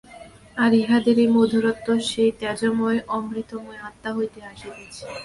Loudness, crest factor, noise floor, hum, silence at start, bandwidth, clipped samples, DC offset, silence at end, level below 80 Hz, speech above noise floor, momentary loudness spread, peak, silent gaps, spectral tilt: -21 LUFS; 16 dB; -45 dBFS; none; 0.1 s; 11.5 kHz; under 0.1%; under 0.1%; 0 s; -56 dBFS; 23 dB; 20 LU; -6 dBFS; none; -5 dB/octave